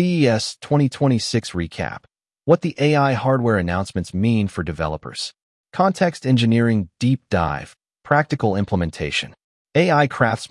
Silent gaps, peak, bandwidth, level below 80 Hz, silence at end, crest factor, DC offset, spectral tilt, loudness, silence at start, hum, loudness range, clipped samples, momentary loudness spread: 5.42-5.64 s, 9.44-9.65 s; -2 dBFS; 12 kHz; -48 dBFS; 0.05 s; 18 dB; under 0.1%; -6 dB/octave; -20 LUFS; 0 s; none; 1 LU; under 0.1%; 11 LU